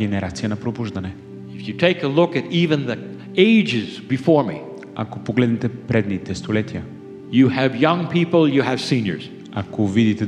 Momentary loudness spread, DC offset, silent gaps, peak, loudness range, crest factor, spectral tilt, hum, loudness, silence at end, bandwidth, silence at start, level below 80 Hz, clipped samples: 15 LU; under 0.1%; none; 0 dBFS; 3 LU; 20 dB; -7 dB/octave; none; -20 LUFS; 0 s; 10.5 kHz; 0 s; -54 dBFS; under 0.1%